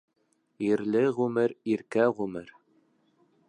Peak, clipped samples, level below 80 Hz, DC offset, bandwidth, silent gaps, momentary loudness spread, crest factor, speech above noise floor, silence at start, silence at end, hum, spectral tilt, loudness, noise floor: -10 dBFS; under 0.1%; -72 dBFS; under 0.1%; 10.5 kHz; none; 9 LU; 18 dB; 40 dB; 0.6 s; 1 s; none; -7.5 dB/octave; -28 LUFS; -67 dBFS